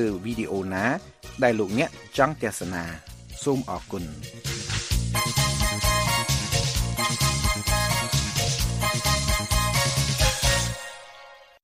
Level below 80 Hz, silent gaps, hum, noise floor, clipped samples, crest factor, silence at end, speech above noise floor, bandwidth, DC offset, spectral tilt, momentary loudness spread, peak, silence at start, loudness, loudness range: -34 dBFS; none; none; -48 dBFS; under 0.1%; 22 dB; 0.25 s; 21 dB; 15.5 kHz; under 0.1%; -3.5 dB/octave; 12 LU; -4 dBFS; 0 s; -24 LUFS; 5 LU